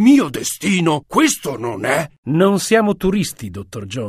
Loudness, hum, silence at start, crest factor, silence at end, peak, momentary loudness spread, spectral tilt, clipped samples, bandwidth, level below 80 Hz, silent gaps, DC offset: -17 LUFS; none; 0 s; 16 dB; 0 s; 0 dBFS; 11 LU; -5 dB/octave; under 0.1%; 15.5 kHz; -44 dBFS; 2.18-2.23 s; under 0.1%